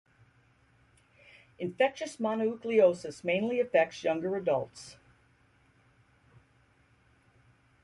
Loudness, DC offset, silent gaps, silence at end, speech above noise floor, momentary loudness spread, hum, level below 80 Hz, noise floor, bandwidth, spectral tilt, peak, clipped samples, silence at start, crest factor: -30 LUFS; under 0.1%; none; 2.9 s; 37 dB; 15 LU; none; -72 dBFS; -66 dBFS; 11.5 kHz; -5.5 dB/octave; -12 dBFS; under 0.1%; 1.6 s; 20 dB